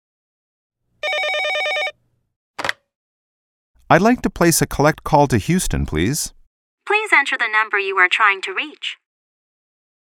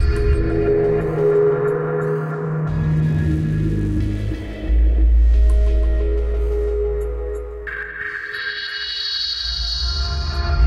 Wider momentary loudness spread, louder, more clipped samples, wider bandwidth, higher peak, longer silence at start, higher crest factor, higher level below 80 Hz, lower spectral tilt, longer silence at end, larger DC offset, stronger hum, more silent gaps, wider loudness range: first, 12 LU vs 9 LU; first, -17 LUFS vs -20 LUFS; neither; first, 17 kHz vs 6.6 kHz; first, 0 dBFS vs -6 dBFS; first, 1.05 s vs 0 s; first, 20 dB vs 12 dB; second, -38 dBFS vs -20 dBFS; second, -4 dB/octave vs -6.5 dB/octave; first, 1.1 s vs 0 s; neither; neither; first, 2.36-2.54 s, 2.95-3.74 s, 6.47-6.78 s vs none; first, 7 LU vs 4 LU